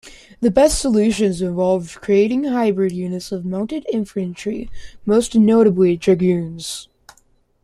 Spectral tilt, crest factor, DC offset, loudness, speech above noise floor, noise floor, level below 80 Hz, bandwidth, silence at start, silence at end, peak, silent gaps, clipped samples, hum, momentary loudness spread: -6 dB/octave; 16 dB; under 0.1%; -18 LUFS; 40 dB; -58 dBFS; -42 dBFS; 13 kHz; 0.05 s; 0.8 s; -2 dBFS; none; under 0.1%; none; 12 LU